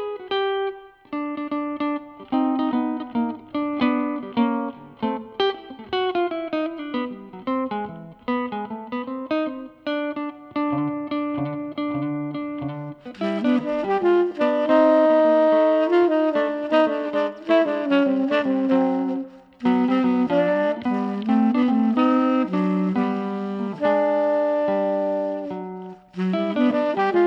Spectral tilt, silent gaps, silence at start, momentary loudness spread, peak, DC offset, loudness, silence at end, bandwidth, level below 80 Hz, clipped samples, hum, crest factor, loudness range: -8 dB/octave; none; 0 s; 12 LU; -6 dBFS; under 0.1%; -22 LUFS; 0 s; 6.2 kHz; -64 dBFS; under 0.1%; none; 16 dB; 9 LU